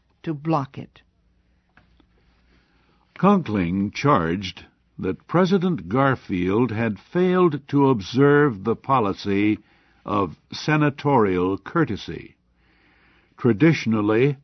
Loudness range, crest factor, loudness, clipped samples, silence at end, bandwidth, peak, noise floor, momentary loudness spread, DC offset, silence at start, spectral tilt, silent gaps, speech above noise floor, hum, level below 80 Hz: 5 LU; 18 dB; -21 LUFS; under 0.1%; 0.1 s; 6.4 kHz; -4 dBFS; -63 dBFS; 11 LU; under 0.1%; 0.25 s; -7.5 dB/octave; none; 42 dB; none; -54 dBFS